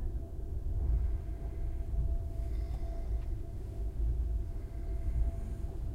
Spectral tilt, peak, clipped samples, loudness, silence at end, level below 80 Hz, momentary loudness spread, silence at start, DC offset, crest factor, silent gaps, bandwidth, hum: -9 dB/octave; -20 dBFS; under 0.1%; -39 LUFS; 0 s; -34 dBFS; 7 LU; 0 s; under 0.1%; 14 dB; none; 2.7 kHz; none